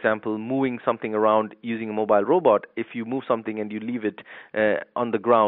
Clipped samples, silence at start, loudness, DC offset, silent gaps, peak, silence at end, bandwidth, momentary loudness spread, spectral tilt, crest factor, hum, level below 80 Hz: under 0.1%; 0 s; -24 LUFS; under 0.1%; none; -4 dBFS; 0 s; 4.1 kHz; 11 LU; -4.5 dB/octave; 18 dB; none; -70 dBFS